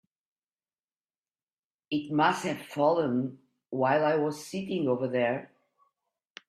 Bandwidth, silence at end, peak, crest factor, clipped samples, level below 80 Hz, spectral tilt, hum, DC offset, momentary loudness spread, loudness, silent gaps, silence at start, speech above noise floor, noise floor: 14.5 kHz; 1.05 s; -10 dBFS; 20 dB; under 0.1%; -74 dBFS; -6 dB/octave; none; under 0.1%; 10 LU; -29 LUFS; none; 1.9 s; over 62 dB; under -90 dBFS